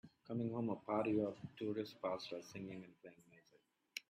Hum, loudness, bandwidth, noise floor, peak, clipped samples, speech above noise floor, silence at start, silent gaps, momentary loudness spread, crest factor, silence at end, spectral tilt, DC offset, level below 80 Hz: none; -43 LUFS; 15 kHz; -76 dBFS; -26 dBFS; under 0.1%; 33 dB; 0.05 s; none; 15 LU; 20 dB; 0.1 s; -6.5 dB/octave; under 0.1%; -80 dBFS